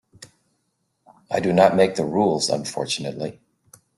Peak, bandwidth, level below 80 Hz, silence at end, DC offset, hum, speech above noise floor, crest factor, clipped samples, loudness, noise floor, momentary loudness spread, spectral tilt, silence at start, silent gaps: -2 dBFS; 12.5 kHz; -60 dBFS; 0.65 s; under 0.1%; none; 52 dB; 22 dB; under 0.1%; -21 LUFS; -72 dBFS; 13 LU; -4.5 dB/octave; 0.2 s; none